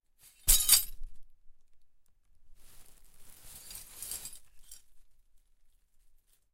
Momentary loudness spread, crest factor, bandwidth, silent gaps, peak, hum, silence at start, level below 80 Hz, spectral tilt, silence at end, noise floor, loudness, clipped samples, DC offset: 25 LU; 28 dB; 16.5 kHz; none; -8 dBFS; none; 0.45 s; -44 dBFS; 1.5 dB/octave; 1.4 s; -63 dBFS; -26 LUFS; under 0.1%; under 0.1%